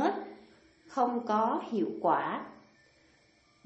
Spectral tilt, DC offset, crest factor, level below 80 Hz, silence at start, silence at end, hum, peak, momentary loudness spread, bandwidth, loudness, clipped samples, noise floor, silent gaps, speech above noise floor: -6.5 dB/octave; under 0.1%; 20 dB; -78 dBFS; 0 s; 1.05 s; none; -14 dBFS; 12 LU; 8.2 kHz; -31 LUFS; under 0.1%; -66 dBFS; none; 36 dB